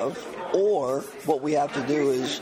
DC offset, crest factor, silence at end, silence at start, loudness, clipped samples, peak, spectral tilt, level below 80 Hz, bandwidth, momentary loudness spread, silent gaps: under 0.1%; 16 dB; 0 s; 0 s; -25 LUFS; under 0.1%; -10 dBFS; -5 dB/octave; -66 dBFS; 15.5 kHz; 7 LU; none